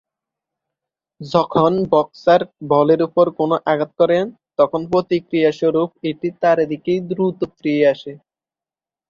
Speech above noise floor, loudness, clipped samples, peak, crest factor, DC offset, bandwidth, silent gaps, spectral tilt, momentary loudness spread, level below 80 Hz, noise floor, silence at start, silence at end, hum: over 73 dB; -18 LUFS; under 0.1%; -2 dBFS; 16 dB; under 0.1%; 7.2 kHz; none; -7.5 dB/octave; 8 LU; -58 dBFS; under -90 dBFS; 1.2 s; 0.95 s; none